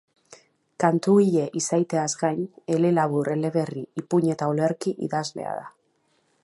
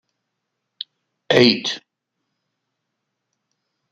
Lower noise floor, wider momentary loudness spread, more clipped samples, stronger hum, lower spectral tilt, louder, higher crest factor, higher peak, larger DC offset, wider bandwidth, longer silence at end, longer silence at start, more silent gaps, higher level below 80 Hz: second, -68 dBFS vs -78 dBFS; second, 12 LU vs 21 LU; neither; neither; first, -6 dB/octave vs -4.5 dB/octave; second, -24 LUFS vs -16 LUFS; about the same, 20 dB vs 24 dB; second, -4 dBFS vs 0 dBFS; neither; first, 11.5 kHz vs 9 kHz; second, 0.75 s vs 2.15 s; second, 0.3 s vs 1.3 s; neither; second, -72 dBFS vs -64 dBFS